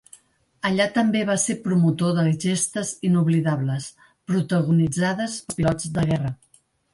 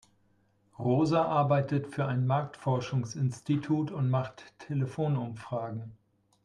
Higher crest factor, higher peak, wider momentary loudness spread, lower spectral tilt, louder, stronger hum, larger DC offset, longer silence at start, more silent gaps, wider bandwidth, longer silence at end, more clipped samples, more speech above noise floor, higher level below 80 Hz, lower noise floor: about the same, 14 dB vs 16 dB; first, -8 dBFS vs -14 dBFS; about the same, 8 LU vs 10 LU; second, -5.5 dB/octave vs -8 dB/octave; first, -22 LUFS vs -30 LUFS; neither; neither; second, 0.65 s vs 0.8 s; neither; first, 11.5 kHz vs 10 kHz; about the same, 0.6 s vs 0.5 s; neither; second, 31 dB vs 39 dB; first, -52 dBFS vs -66 dBFS; second, -53 dBFS vs -69 dBFS